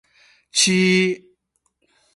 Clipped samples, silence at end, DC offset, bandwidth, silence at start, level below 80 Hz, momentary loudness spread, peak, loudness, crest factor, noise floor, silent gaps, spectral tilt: under 0.1%; 1 s; under 0.1%; 11.5 kHz; 0.55 s; -64 dBFS; 9 LU; -2 dBFS; -17 LUFS; 20 dB; -70 dBFS; none; -3.5 dB/octave